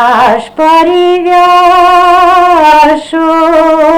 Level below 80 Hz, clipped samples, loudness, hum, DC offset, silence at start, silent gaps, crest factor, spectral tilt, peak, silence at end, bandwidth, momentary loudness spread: -36 dBFS; 2%; -5 LUFS; none; under 0.1%; 0 s; none; 6 dB; -4 dB/octave; 0 dBFS; 0 s; 19 kHz; 4 LU